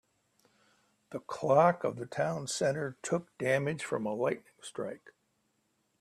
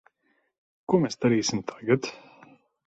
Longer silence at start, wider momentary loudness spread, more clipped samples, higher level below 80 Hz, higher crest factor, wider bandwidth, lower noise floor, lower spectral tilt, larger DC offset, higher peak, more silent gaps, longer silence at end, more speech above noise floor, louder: first, 1.1 s vs 0.9 s; first, 16 LU vs 11 LU; neither; second, -74 dBFS vs -66 dBFS; about the same, 22 dB vs 20 dB; first, 13.5 kHz vs 8.2 kHz; first, -77 dBFS vs -72 dBFS; about the same, -5 dB/octave vs -5 dB/octave; neither; second, -12 dBFS vs -8 dBFS; neither; first, 1.05 s vs 0.7 s; about the same, 45 dB vs 47 dB; second, -32 LUFS vs -26 LUFS